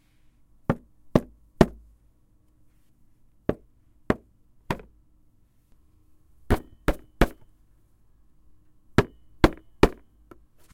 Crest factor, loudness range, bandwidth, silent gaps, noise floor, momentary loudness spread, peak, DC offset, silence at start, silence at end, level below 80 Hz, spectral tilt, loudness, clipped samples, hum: 30 dB; 8 LU; 16.5 kHz; none; -61 dBFS; 11 LU; 0 dBFS; under 0.1%; 0.7 s; 0.8 s; -38 dBFS; -7 dB/octave; -27 LUFS; under 0.1%; none